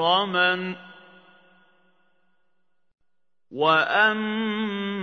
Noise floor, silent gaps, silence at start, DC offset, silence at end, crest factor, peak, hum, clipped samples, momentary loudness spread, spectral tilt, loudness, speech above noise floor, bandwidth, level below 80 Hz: -83 dBFS; none; 0 s; under 0.1%; 0 s; 20 dB; -6 dBFS; none; under 0.1%; 14 LU; -6 dB/octave; -22 LUFS; 60 dB; 6.6 kHz; -78 dBFS